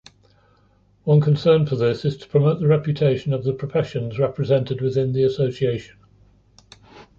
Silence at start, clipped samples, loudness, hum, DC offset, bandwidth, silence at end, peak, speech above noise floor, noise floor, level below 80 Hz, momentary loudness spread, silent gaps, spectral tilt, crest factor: 1.05 s; under 0.1%; -21 LUFS; none; under 0.1%; 7.2 kHz; 0.15 s; -4 dBFS; 39 dB; -58 dBFS; -54 dBFS; 7 LU; none; -9 dB/octave; 16 dB